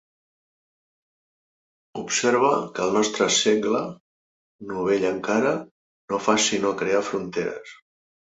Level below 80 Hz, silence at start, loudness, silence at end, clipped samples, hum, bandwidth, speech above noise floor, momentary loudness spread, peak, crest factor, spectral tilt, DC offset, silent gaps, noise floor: -64 dBFS; 1.95 s; -23 LUFS; 0.55 s; under 0.1%; none; 8.2 kHz; over 67 dB; 14 LU; -4 dBFS; 20 dB; -3 dB/octave; under 0.1%; 4.00-4.59 s, 5.71-6.08 s; under -90 dBFS